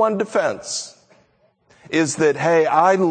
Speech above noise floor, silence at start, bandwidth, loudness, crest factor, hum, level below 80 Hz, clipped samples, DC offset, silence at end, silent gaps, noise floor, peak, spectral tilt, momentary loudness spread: 42 dB; 0 s; 9.4 kHz; -19 LUFS; 18 dB; none; -66 dBFS; under 0.1%; under 0.1%; 0 s; none; -60 dBFS; -2 dBFS; -4.5 dB/octave; 12 LU